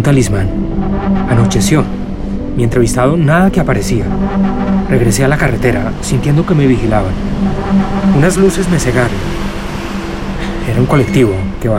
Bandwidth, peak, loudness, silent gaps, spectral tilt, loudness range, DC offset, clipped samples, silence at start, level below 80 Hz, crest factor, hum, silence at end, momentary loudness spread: 16 kHz; 0 dBFS; -13 LUFS; none; -6.5 dB/octave; 2 LU; under 0.1%; under 0.1%; 0 s; -22 dBFS; 12 dB; none; 0 s; 10 LU